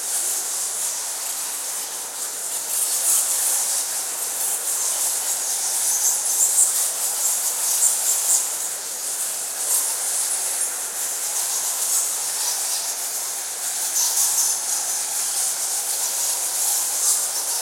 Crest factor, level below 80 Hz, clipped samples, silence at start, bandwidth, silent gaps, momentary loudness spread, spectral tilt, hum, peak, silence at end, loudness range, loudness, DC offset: 20 dB; -80 dBFS; under 0.1%; 0 s; 16.5 kHz; none; 7 LU; 3.5 dB/octave; none; -2 dBFS; 0 s; 3 LU; -20 LUFS; under 0.1%